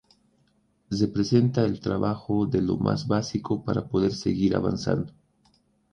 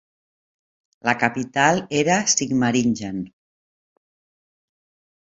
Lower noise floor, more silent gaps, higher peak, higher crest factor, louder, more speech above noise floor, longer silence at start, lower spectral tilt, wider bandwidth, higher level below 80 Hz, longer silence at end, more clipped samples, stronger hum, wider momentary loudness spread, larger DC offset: second, -67 dBFS vs under -90 dBFS; neither; second, -8 dBFS vs -2 dBFS; about the same, 18 dB vs 22 dB; second, -26 LUFS vs -20 LUFS; second, 42 dB vs over 70 dB; second, 0.9 s vs 1.05 s; first, -7 dB/octave vs -3.5 dB/octave; first, 10 kHz vs 8.4 kHz; first, -50 dBFS vs -60 dBFS; second, 0.85 s vs 1.95 s; neither; neither; second, 6 LU vs 11 LU; neither